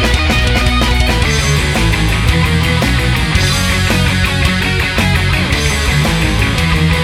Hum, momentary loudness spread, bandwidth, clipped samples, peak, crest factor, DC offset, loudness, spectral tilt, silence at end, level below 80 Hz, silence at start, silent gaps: none; 1 LU; 16.5 kHz; under 0.1%; 0 dBFS; 12 dB; under 0.1%; -12 LUFS; -4.5 dB/octave; 0 s; -18 dBFS; 0 s; none